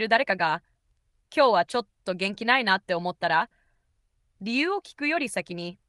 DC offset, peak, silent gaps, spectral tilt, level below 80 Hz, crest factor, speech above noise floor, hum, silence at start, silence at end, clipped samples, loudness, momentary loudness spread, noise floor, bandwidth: under 0.1%; -6 dBFS; none; -4 dB/octave; -70 dBFS; 22 dB; 45 dB; none; 0 s; 0.15 s; under 0.1%; -25 LUFS; 11 LU; -71 dBFS; 12 kHz